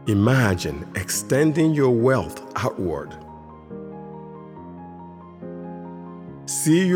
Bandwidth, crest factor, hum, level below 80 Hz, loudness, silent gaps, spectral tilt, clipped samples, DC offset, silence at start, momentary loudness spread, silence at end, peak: 18.5 kHz; 18 dB; none; -50 dBFS; -21 LUFS; none; -5.5 dB/octave; under 0.1%; under 0.1%; 0 s; 21 LU; 0 s; -4 dBFS